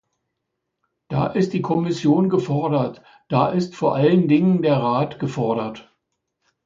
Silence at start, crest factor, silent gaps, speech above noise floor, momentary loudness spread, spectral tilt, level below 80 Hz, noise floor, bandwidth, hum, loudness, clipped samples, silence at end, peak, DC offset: 1.1 s; 18 dB; none; 59 dB; 8 LU; -8 dB/octave; -58 dBFS; -78 dBFS; 7.6 kHz; none; -20 LUFS; under 0.1%; 0.85 s; -2 dBFS; under 0.1%